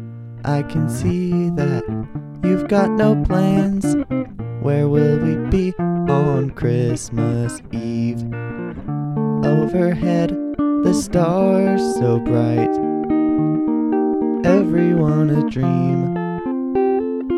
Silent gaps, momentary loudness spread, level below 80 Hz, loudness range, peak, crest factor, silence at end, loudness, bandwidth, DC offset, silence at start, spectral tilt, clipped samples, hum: none; 8 LU; -38 dBFS; 3 LU; -2 dBFS; 16 dB; 0 s; -18 LUFS; 13 kHz; under 0.1%; 0 s; -8 dB/octave; under 0.1%; none